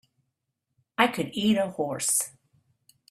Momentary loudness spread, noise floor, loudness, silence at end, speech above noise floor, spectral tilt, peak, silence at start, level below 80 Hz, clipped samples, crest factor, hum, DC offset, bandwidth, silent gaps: 8 LU; -81 dBFS; -26 LUFS; 0.8 s; 55 dB; -3 dB/octave; -2 dBFS; 1 s; -68 dBFS; under 0.1%; 26 dB; none; under 0.1%; 16 kHz; none